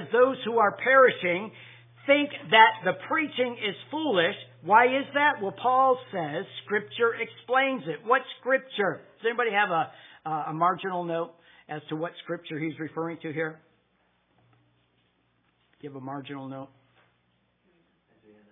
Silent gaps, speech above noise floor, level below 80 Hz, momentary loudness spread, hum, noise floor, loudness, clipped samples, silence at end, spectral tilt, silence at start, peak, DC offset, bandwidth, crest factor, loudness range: none; 44 dB; -84 dBFS; 18 LU; none; -70 dBFS; -25 LUFS; under 0.1%; 1.85 s; -8 dB/octave; 0 s; -2 dBFS; under 0.1%; 3.9 kHz; 24 dB; 21 LU